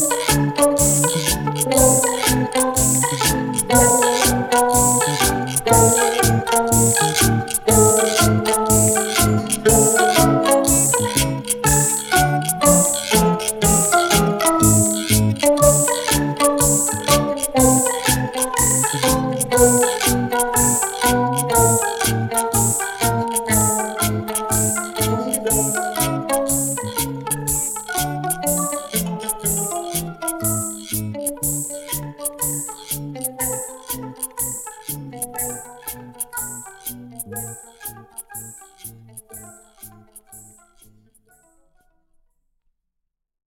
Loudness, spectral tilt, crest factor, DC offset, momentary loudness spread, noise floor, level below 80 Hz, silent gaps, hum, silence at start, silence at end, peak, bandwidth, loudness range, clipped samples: -17 LUFS; -3.5 dB/octave; 18 dB; under 0.1%; 14 LU; -77 dBFS; -36 dBFS; none; none; 0 s; 3.05 s; 0 dBFS; over 20 kHz; 12 LU; under 0.1%